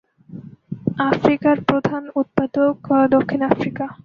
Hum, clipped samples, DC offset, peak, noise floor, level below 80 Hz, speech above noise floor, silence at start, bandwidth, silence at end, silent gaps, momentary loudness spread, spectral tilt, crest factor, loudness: none; under 0.1%; under 0.1%; -2 dBFS; -38 dBFS; -54 dBFS; 20 dB; 0.3 s; 6.6 kHz; 0.1 s; none; 15 LU; -8.5 dB/octave; 18 dB; -19 LUFS